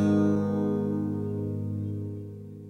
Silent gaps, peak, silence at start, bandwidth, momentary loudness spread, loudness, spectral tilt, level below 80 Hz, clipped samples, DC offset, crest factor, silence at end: none; -14 dBFS; 0 s; 6.8 kHz; 13 LU; -29 LUFS; -9.5 dB/octave; -62 dBFS; under 0.1%; under 0.1%; 14 dB; 0 s